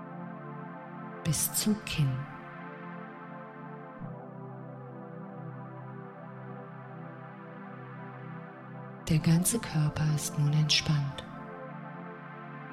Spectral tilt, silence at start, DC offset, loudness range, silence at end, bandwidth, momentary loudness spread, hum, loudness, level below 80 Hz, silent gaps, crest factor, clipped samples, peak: -4.5 dB/octave; 0 s; under 0.1%; 15 LU; 0 s; 16 kHz; 18 LU; none; -31 LUFS; -58 dBFS; none; 22 dB; under 0.1%; -12 dBFS